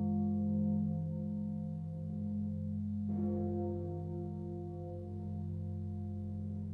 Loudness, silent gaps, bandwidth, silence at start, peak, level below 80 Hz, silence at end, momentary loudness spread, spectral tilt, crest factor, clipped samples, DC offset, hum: -39 LUFS; none; 1.9 kHz; 0 s; -26 dBFS; -64 dBFS; 0 s; 8 LU; -12.5 dB/octave; 12 dB; under 0.1%; under 0.1%; none